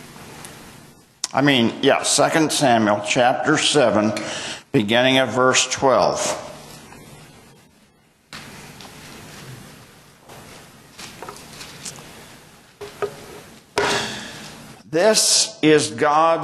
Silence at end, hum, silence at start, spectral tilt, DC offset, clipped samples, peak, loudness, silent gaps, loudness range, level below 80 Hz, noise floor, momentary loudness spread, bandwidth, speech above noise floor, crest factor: 0 s; none; 0 s; -3 dB/octave; under 0.1%; under 0.1%; -2 dBFS; -18 LUFS; none; 23 LU; -58 dBFS; -56 dBFS; 23 LU; 13.5 kHz; 39 dB; 18 dB